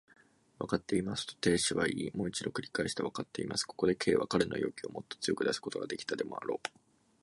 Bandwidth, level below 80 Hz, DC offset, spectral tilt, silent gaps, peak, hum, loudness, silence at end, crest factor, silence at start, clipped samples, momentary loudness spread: 11.5 kHz; -62 dBFS; under 0.1%; -4 dB/octave; none; -14 dBFS; none; -34 LUFS; 0.55 s; 22 dB; 0.6 s; under 0.1%; 9 LU